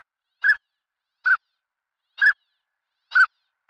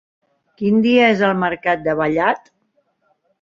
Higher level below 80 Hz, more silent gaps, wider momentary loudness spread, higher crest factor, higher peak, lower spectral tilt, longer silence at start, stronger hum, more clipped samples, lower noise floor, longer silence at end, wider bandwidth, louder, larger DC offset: second, -72 dBFS vs -56 dBFS; neither; about the same, 6 LU vs 7 LU; about the same, 16 dB vs 16 dB; second, -8 dBFS vs -2 dBFS; second, 3 dB/octave vs -7 dB/octave; second, 0.45 s vs 0.6 s; neither; neither; first, -84 dBFS vs -65 dBFS; second, 0.45 s vs 1.05 s; first, 9.2 kHz vs 7.2 kHz; second, -21 LUFS vs -17 LUFS; neither